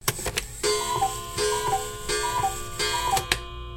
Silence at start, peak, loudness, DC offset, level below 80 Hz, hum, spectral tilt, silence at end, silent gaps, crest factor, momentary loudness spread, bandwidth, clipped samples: 0 s; -4 dBFS; -26 LUFS; under 0.1%; -42 dBFS; none; -2 dB/octave; 0 s; none; 24 dB; 4 LU; 17 kHz; under 0.1%